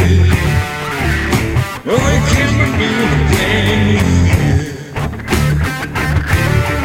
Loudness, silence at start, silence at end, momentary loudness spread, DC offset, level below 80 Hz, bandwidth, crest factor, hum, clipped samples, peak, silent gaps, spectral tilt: -14 LUFS; 0 s; 0 s; 6 LU; under 0.1%; -22 dBFS; 16.5 kHz; 12 dB; none; under 0.1%; 0 dBFS; none; -5.5 dB/octave